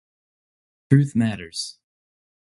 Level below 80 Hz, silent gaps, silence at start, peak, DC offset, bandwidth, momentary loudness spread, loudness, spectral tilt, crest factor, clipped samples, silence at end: -58 dBFS; none; 0.9 s; -2 dBFS; under 0.1%; 11.5 kHz; 12 LU; -22 LUFS; -6.5 dB/octave; 24 dB; under 0.1%; 0.75 s